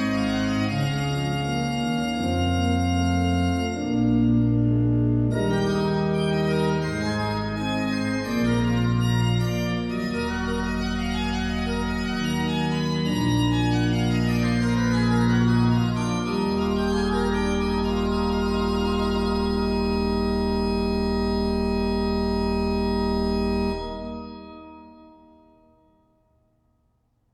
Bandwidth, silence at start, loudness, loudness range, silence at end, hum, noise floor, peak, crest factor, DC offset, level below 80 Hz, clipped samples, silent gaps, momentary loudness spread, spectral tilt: 13.5 kHz; 0 s; -24 LUFS; 4 LU; 2.25 s; none; -67 dBFS; -10 dBFS; 14 dB; under 0.1%; -36 dBFS; under 0.1%; none; 5 LU; -6.5 dB/octave